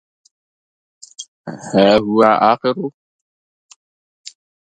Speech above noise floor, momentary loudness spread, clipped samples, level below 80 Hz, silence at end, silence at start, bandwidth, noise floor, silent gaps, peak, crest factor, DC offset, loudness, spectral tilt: over 76 dB; 21 LU; under 0.1%; -54 dBFS; 0.4 s; 1.2 s; 10.5 kHz; under -90 dBFS; 1.28-1.44 s, 2.94-3.69 s, 3.76-4.24 s; 0 dBFS; 18 dB; under 0.1%; -14 LUFS; -5.5 dB/octave